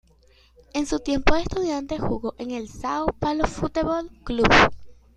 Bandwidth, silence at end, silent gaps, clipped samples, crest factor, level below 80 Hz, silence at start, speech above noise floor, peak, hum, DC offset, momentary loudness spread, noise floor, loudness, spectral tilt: 10.5 kHz; 0.25 s; none; under 0.1%; 22 dB; -36 dBFS; 0.75 s; 34 dB; -2 dBFS; none; under 0.1%; 14 LU; -56 dBFS; -23 LUFS; -5 dB/octave